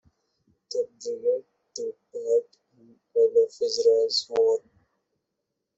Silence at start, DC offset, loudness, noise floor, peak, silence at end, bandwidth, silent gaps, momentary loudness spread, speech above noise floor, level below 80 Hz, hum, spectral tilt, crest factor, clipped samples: 0.7 s; under 0.1%; -25 LUFS; -82 dBFS; -10 dBFS; 1.2 s; 8 kHz; none; 14 LU; 57 dB; -76 dBFS; none; -1.5 dB/octave; 16 dB; under 0.1%